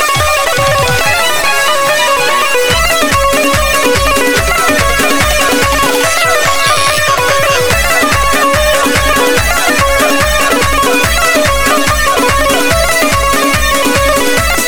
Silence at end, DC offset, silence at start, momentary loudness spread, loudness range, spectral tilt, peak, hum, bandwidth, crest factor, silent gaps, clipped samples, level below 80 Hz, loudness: 0 s; under 0.1%; 0 s; 1 LU; 0 LU; -2.5 dB/octave; 0 dBFS; none; over 20 kHz; 10 dB; none; under 0.1%; -22 dBFS; -9 LUFS